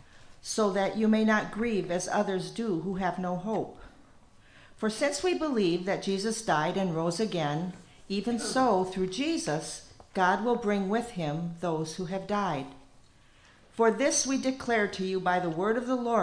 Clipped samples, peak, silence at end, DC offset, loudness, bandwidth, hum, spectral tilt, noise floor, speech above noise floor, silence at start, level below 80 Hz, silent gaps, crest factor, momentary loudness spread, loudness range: under 0.1%; -12 dBFS; 0 s; under 0.1%; -29 LUFS; 10.5 kHz; none; -4.5 dB/octave; -58 dBFS; 29 dB; 0.15 s; -58 dBFS; none; 18 dB; 9 LU; 4 LU